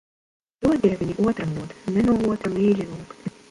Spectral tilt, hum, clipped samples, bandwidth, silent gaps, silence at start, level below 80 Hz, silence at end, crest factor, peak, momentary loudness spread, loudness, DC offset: -8 dB/octave; none; under 0.1%; 11.5 kHz; none; 0.6 s; -48 dBFS; 0.2 s; 18 dB; -6 dBFS; 14 LU; -23 LUFS; under 0.1%